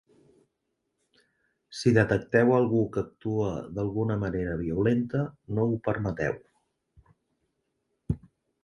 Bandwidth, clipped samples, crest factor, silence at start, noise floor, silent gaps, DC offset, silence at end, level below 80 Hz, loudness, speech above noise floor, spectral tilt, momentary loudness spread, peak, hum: 11 kHz; under 0.1%; 22 dB; 1.7 s; -80 dBFS; none; under 0.1%; 0.45 s; -50 dBFS; -27 LUFS; 54 dB; -7.5 dB/octave; 12 LU; -8 dBFS; none